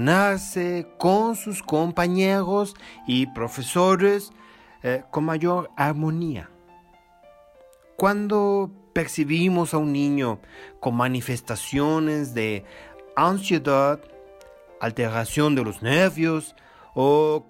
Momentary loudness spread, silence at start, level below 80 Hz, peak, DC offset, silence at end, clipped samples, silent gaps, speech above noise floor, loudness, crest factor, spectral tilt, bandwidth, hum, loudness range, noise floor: 10 LU; 0 s; -54 dBFS; -8 dBFS; under 0.1%; 0.05 s; under 0.1%; none; 31 dB; -23 LUFS; 16 dB; -5.5 dB/octave; 16 kHz; none; 4 LU; -54 dBFS